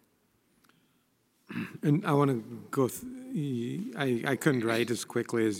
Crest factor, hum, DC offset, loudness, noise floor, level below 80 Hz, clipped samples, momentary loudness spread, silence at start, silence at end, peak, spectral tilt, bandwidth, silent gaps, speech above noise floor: 20 dB; none; under 0.1%; -30 LUFS; -71 dBFS; -76 dBFS; under 0.1%; 11 LU; 1.5 s; 0 s; -10 dBFS; -6 dB/octave; 16 kHz; none; 42 dB